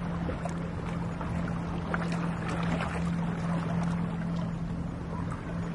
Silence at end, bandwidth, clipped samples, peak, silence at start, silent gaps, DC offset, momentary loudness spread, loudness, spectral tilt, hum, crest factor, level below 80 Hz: 0 s; 11 kHz; under 0.1%; -14 dBFS; 0 s; none; under 0.1%; 5 LU; -33 LUFS; -7.5 dB/octave; none; 18 dB; -44 dBFS